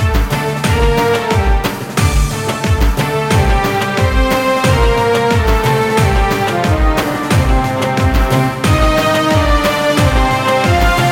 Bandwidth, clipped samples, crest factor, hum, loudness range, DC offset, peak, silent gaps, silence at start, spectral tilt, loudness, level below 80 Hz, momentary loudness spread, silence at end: 17 kHz; under 0.1%; 12 dB; none; 2 LU; under 0.1%; 0 dBFS; none; 0 s; -5.5 dB/octave; -13 LUFS; -18 dBFS; 4 LU; 0 s